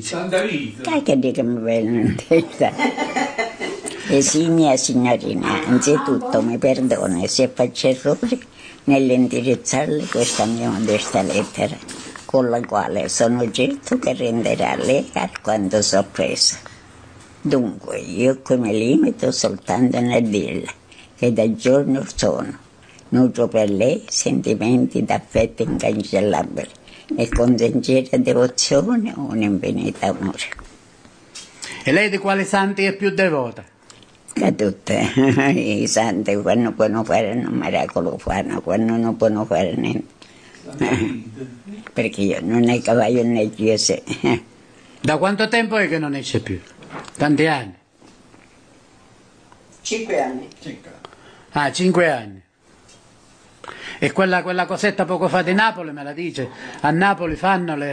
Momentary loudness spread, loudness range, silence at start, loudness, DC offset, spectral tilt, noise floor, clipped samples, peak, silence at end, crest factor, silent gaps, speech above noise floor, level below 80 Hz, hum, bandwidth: 12 LU; 5 LU; 0 s; -19 LUFS; under 0.1%; -4.5 dB/octave; -52 dBFS; under 0.1%; -4 dBFS; 0 s; 16 dB; none; 33 dB; -46 dBFS; none; 10 kHz